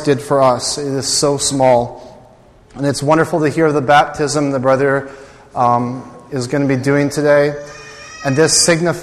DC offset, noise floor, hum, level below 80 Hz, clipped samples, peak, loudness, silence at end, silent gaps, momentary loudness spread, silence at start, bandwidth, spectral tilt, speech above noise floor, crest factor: under 0.1%; -44 dBFS; none; -46 dBFS; under 0.1%; 0 dBFS; -14 LUFS; 0 s; none; 15 LU; 0 s; 14 kHz; -4 dB/octave; 30 dB; 14 dB